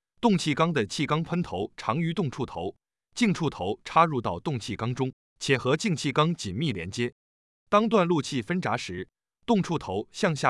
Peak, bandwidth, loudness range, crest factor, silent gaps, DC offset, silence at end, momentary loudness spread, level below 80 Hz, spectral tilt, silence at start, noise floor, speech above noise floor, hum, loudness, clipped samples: -6 dBFS; 12 kHz; 2 LU; 20 dB; 5.13-5.36 s, 7.12-7.66 s; under 0.1%; 0 s; 10 LU; -60 dBFS; -5.5 dB/octave; 0.2 s; under -90 dBFS; over 64 dB; none; -27 LUFS; under 0.1%